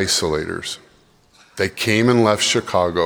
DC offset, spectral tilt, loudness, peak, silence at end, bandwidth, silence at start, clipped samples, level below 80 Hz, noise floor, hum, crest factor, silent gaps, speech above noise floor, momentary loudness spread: under 0.1%; -3.5 dB/octave; -18 LUFS; -2 dBFS; 0 s; over 20 kHz; 0 s; under 0.1%; -50 dBFS; -54 dBFS; none; 18 dB; none; 36 dB; 14 LU